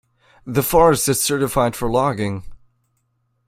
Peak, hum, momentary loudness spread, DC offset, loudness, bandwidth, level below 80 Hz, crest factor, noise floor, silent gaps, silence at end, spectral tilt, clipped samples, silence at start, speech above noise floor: -2 dBFS; none; 11 LU; under 0.1%; -18 LUFS; 16.5 kHz; -40 dBFS; 18 dB; -68 dBFS; none; 0.9 s; -4.5 dB/octave; under 0.1%; 0.45 s; 50 dB